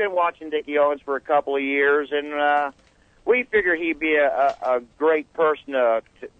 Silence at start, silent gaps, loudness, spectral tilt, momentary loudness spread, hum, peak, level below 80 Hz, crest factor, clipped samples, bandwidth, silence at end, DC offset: 0 s; none; -22 LUFS; -5.5 dB/octave; 6 LU; none; -6 dBFS; -60 dBFS; 16 dB; under 0.1%; 7 kHz; 0.1 s; under 0.1%